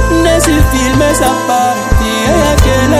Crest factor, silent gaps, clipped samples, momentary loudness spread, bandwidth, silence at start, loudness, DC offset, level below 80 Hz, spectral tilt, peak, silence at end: 10 dB; none; 0.5%; 3 LU; 16 kHz; 0 s; -10 LUFS; under 0.1%; -16 dBFS; -4.5 dB/octave; 0 dBFS; 0 s